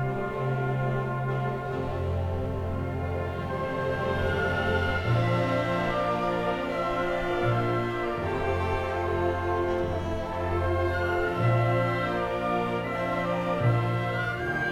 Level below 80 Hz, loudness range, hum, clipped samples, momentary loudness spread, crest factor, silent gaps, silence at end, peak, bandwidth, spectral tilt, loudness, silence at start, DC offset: -44 dBFS; 3 LU; none; under 0.1%; 6 LU; 14 dB; none; 0 s; -12 dBFS; 12.5 kHz; -7.5 dB/octave; -28 LUFS; 0 s; under 0.1%